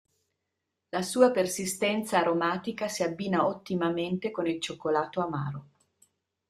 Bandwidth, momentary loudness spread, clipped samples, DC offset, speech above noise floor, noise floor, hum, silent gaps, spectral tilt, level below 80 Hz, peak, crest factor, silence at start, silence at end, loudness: 15 kHz; 9 LU; under 0.1%; under 0.1%; 55 dB; -83 dBFS; none; none; -4.5 dB/octave; -70 dBFS; -8 dBFS; 22 dB; 0.95 s; 0.85 s; -29 LUFS